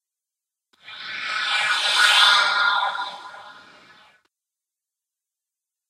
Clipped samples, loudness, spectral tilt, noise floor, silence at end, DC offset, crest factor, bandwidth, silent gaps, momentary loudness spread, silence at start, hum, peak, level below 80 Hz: under 0.1%; -18 LUFS; 2.5 dB/octave; -87 dBFS; 2.4 s; under 0.1%; 22 dB; 15 kHz; none; 21 LU; 0.85 s; none; -2 dBFS; -80 dBFS